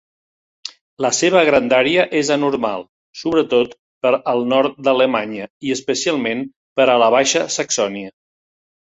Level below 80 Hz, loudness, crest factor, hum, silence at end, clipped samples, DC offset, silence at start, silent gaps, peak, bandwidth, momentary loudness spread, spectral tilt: -58 dBFS; -17 LUFS; 16 dB; none; 0.7 s; under 0.1%; under 0.1%; 0.65 s; 0.81-0.97 s, 2.89-3.13 s, 3.79-4.01 s, 5.50-5.61 s, 6.56-6.76 s; -2 dBFS; 8.4 kHz; 15 LU; -3 dB/octave